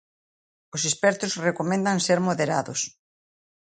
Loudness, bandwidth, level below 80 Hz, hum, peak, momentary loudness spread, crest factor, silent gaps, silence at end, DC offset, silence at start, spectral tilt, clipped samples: -24 LUFS; 9.6 kHz; -70 dBFS; none; -8 dBFS; 7 LU; 18 dB; none; 0.9 s; under 0.1%; 0.75 s; -3.5 dB/octave; under 0.1%